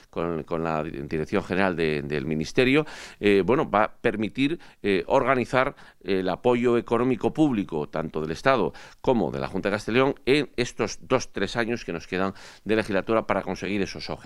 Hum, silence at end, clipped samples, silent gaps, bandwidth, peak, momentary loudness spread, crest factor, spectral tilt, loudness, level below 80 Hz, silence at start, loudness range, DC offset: none; 0 s; under 0.1%; none; 12 kHz; -2 dBFS; 8 LU; 22 dB; -6 dB/octave; -25 LUFS; -48 dBFS; 0.15 s; 2 LU; under 0.1%